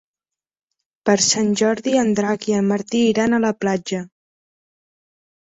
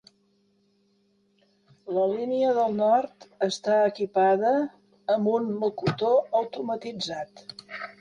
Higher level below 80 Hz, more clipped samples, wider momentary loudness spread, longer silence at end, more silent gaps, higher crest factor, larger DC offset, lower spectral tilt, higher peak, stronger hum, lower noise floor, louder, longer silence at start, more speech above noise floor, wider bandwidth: first, -60 dBFS vs -68 dBFS; neither; second, 8 LU vs 16 LU; first, 1.35 s vs 0.1 s; neither; about the same, 18 dB vs 16 dB; neither; second, -4 dB/octave vs -5.5 dB/octave; first, -2 dBFS vs -12 dBFS; neither; first, -89 dBFS vs -67 dBFS; first, -19 LUFS vs -25 LUFS; second, 1.05 s vs 1.85 s; first, 71 dB vs 42 dB; second, 8.4 kHz vs 10.5 kHz